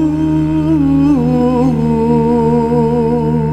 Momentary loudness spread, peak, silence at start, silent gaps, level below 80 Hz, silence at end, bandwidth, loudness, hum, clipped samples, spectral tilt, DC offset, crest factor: 2 LU; -2 dBFS; 0 s; none; -30 dBFS; 0 s; 9 kHz; -12 LUFS; none; under 0.1%; -9.5 dB/octave; under 0.1%; 10 dB